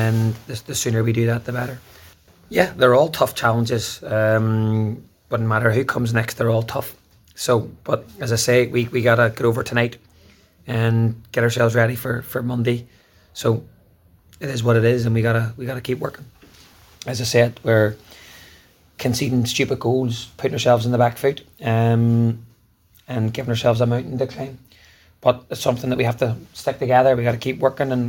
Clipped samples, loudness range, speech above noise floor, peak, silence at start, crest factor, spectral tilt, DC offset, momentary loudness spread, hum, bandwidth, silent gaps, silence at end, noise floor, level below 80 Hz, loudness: under 0.1%; 3 LU; 37 dB; -2 dBFS; 0 s; 18 dB; -6 dB/octave; under 0.1%; 10 LU; none; 17 kHz; none; 0 s; -56 dBFS; -52 dBFS; -20 LUFS